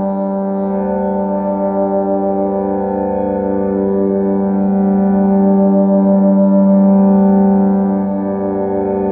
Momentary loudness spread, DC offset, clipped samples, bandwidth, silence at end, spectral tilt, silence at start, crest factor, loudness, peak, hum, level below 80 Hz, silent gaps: 7 LU; under 0.1%; under 0.1%; 2.5 kHz; 0 s; -12.5 dB/octave; 0 s; 10 dB; -14 LUFS; -2 dBFS; none; -44 dBFS; none